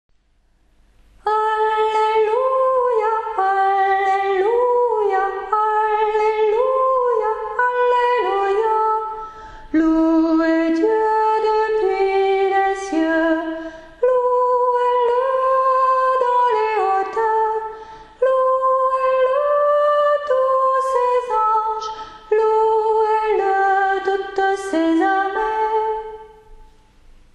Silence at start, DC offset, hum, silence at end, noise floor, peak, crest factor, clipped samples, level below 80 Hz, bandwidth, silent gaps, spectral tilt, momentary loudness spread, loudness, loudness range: 1.25 s; under 0.1%; none; 0.7 s; -59 dBFS; -4 dBFS; 14 dB; under 0.1%; -50 dBFS; 9.8 kHz; none; -4 dB/octave; 6 LU; -18 LUFS; 2 LU